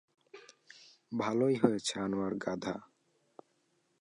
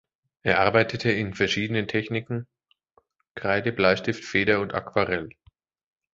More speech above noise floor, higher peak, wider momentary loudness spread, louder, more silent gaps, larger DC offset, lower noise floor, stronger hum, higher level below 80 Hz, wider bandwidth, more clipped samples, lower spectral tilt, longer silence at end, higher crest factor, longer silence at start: about the same, 43 dB vs 42 dB; second, -12 dBFS vs -2 dBFS; first, 26 LU vs 10 LU; second, -33 LUFS vs -24 LUFS; second, none vs 3.31-3.35 s; neither; first, -75 dBFS vs -66 dBFS; neither; second, -72 dBFS vs -54 dBFS; first, 11 kHz vs 7.8 kHz; neither; about the same, -5 dB/octave vs -5.5 dB/octave; first, 1.15 s vs 0.85 s; about the same, 24 dB vs 24 dB; about the same, 0.35 s vs 0.45 s